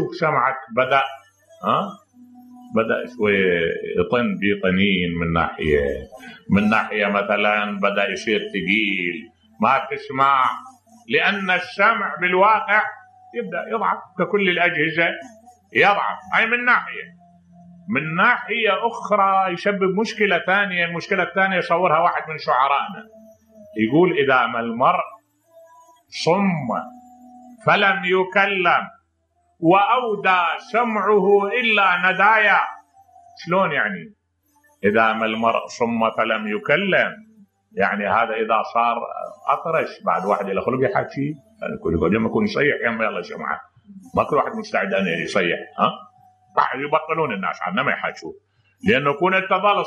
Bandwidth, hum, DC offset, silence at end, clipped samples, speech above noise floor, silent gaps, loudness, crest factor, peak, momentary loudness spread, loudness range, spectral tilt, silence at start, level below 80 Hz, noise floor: 9.8 kHz; none; under 0.1%; 0 s; under 0.1%; 46 dB; none; -19 LUFS; 18 dB; -2 dBFS; 11 LU; 4 LU; -6 dB/octave; 0 s; -52 dBFS; -66 dBFS